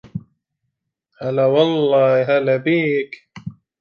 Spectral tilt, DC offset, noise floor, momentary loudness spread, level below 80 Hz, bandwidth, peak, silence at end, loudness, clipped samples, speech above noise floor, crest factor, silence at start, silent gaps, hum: -8 dB/octave; under 0.1%; -76 dBFS; 19 LU; -62 dBFS; 6.6 kHz; -2 dBFS; 0.3 s; -17 LUFS; under 0.1%; 60 dB; 16 dB; 0.15 s; none; none